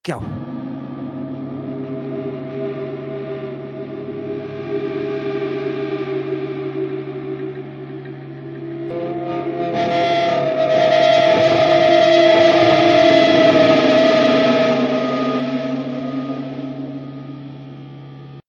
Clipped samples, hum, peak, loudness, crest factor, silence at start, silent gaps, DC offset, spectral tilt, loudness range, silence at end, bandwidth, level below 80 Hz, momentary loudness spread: under 0.1%; none; 0 dBFS; -17 LUFS; 16 dB; 0.05 s; none; under 0.1%; -6 dB/octave; 15 LU; 0.1 s; 7.2 kHz; -56 dBFS; 20 LU